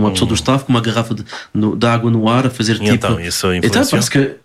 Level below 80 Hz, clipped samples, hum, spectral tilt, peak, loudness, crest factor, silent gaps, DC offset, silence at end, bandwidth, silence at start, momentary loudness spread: -40 dBFS; under 0.1%; none; -5 dB/octave; -2 dBFS; -15 LUFS; 12 dB; none; under 0.1%; 0.1 s; 15 kHz; 0 s; 5 LU